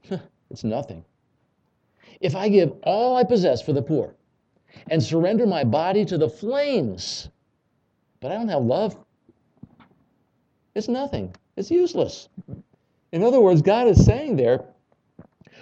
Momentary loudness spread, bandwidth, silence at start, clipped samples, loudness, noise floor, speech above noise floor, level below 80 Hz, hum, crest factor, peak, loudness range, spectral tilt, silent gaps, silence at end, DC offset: 18 LU; 8.2 kHz; 0.1 s; under 0.1%; -21 LUFS; -69 dBFS; 49 dB; -40 dBFS; none; 22 dB; -2 dBFS; 9 LU; -7 dB/octave; none; 0.95 s; under 0.1%